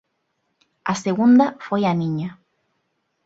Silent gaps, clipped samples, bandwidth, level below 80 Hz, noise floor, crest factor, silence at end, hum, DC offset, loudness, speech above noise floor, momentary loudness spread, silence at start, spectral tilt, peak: none; under 0.1%; 8 kHz; -64 dBFS; -72 dBFS; 16 dB; 0.9 s; none; under 0.1%; -20 LUFS; 54 dB; 14 LU; 0.85 s; -6.5 dB/octave; -4 dBFS